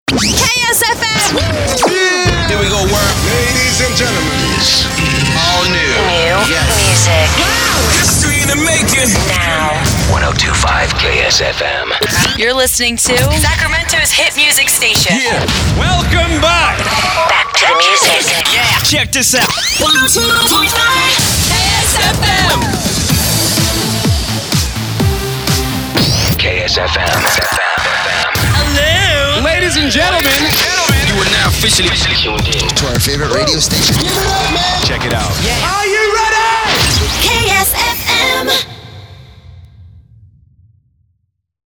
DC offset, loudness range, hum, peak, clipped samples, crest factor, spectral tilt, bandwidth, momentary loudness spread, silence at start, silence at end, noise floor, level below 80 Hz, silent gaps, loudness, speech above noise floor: under 0.1%; 3 LU; none; 0 dBFS; under 0.1%; 12 dB; -2.5 dB/octave; over 20 kHz; 4 LU; 0.05 s; 1.7 s; -63 dBFS; -24 dBFS; none; -10 LUFS; 52 dB